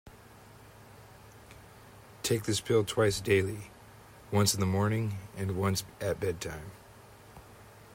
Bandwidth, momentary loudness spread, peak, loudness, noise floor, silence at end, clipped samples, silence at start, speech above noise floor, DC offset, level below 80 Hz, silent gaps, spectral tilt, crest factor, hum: 16 kHz; 25 LU; -14 dBFS; -30 LUFS; -54 dBFS; 0 s; under 0.1%; 0.05 s; 24 dB; under 0.1%; -60 dBFS; none; -4.5 dB/octave; 20 dB; none